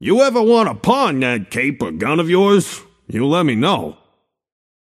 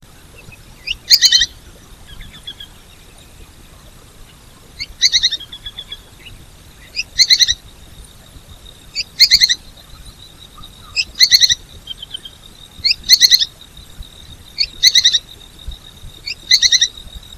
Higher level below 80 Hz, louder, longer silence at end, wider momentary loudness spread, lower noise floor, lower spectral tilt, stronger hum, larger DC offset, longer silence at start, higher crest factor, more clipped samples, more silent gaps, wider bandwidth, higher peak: second, -54 dBFS vs -40 dBFS; second, -16 LUFS vs -11 LUFS; first, 1.05 s vs 0 s; second, 10 LU vs 24 LU; first, -63 dBFS vs -42 dBFS; first, -5.5 dB/octave vs 2 dB/octave; neither; neither; second, 0 s vs 0.85 s; about the same, 16 dB vs 18 dB; second, under 0.1% vs 0.3%; neither; second, 15 kHz vs over 20 kHz; about the same, -2 dBFS vs 0 dBFS